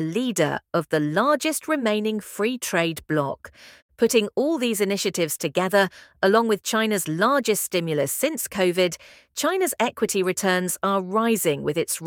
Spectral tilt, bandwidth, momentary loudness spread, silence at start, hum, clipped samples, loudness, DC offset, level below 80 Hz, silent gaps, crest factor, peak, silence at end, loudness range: -4 dB/octave; 18.5 kHz; 5 LU; 0 s; none; under 0.1%; -23 LUFS; under 0.1%; -64 dBFS; 3.82-3.89 s; 18 dB; -4 dBFS; 0 s; 2 LU